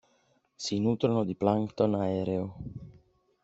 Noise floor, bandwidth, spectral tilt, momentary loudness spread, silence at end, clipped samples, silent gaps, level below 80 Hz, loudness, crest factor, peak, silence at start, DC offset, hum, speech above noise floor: -69 dBFS; 8 kHz; -7 dB/octave; 14 LU; 0.55 s; under 0.1%; none; -60 dBFS; -29 LUFS; 22 dB; -10 dBFS; 0.6 s; under 0.1%; none; 41 dB